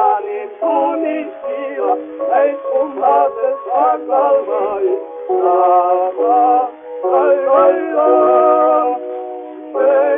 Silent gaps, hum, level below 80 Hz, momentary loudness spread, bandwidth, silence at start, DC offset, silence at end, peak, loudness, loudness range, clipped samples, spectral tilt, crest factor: none; none; -66 dBFS; 12 LU; 3.6 kHz; 0 s; under 0.1%; 0 s; 0 dBFS; -15 LUFS; 4 LU; under 0.1%; -3 dB/octave; 14 dB